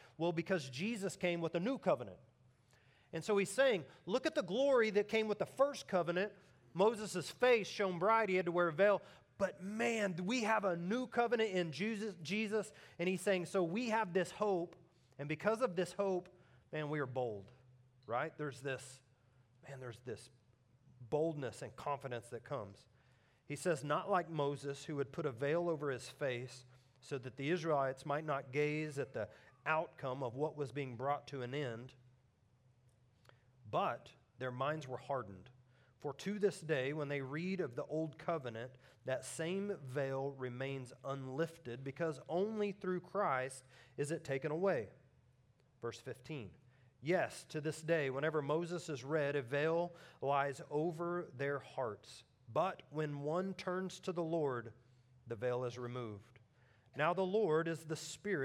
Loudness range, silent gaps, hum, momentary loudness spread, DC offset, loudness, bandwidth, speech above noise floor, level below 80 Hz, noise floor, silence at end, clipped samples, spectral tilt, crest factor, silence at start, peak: 9 LU; none; none; 13 LU; under 0.1%; -39 LUFS; 15.5 kHz; 34 dB; -82 dBFS; -72 dBFS; 0 s; under 0.1%; -5.5 dB/octave; 20 dB; 0 s; -20 dBFS